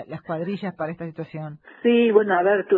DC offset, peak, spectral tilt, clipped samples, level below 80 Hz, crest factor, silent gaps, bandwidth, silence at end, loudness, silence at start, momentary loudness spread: under 0.1%; -4 dBFS; -9.5 dB/octave; under 0.1%; -66 dBFS; 18 dB; none; 4.4 kHz; 0 s; -22 LUFS; 0 s; 16 LU